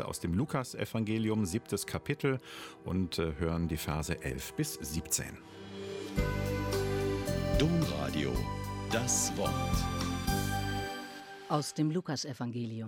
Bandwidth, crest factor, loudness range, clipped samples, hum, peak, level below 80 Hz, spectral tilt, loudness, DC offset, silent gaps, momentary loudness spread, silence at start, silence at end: 17 kHz; 18 dB; 3 LU; under 0.1%; none; -16 dBFS; -44 dBFS; -4.5 dB/octave; -34 LUFS; under 0.1%; none; 9 LU; 0 s; 0 s